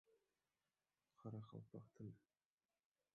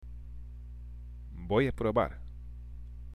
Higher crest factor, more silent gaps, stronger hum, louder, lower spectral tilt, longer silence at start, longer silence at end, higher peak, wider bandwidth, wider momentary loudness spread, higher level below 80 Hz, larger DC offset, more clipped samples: about the same, 20 dB vs 20 dB; neither; second, none vs 60 Hz at -45 dBFS; second, -59 LUFS vs -30 LUFS; first, -9.5 dB/octave vs -8 dB/octave; about the same, 0.1 s vs 0 s; first, 0.95 s vs 0 s; second, -42 dBFS vs -14 dBFS; second, 6.6 kHz vs 12 kHz; second, 5 LU vs 18 LU; second, -90 dBFS vs -44 dBFS; neither; neither